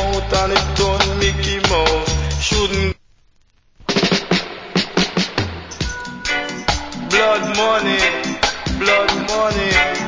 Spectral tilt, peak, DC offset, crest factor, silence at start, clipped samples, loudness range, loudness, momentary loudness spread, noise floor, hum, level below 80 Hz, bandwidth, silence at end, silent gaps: -3.5 dB/octave; 0 dBFS; under 0.1%; 18 dB; 0 s; under 0.1%; 4 LU; -17 LUFS; 9 LU; -55 dBFS; none; -28 dBFS; 7.8 kHz; 0 s; none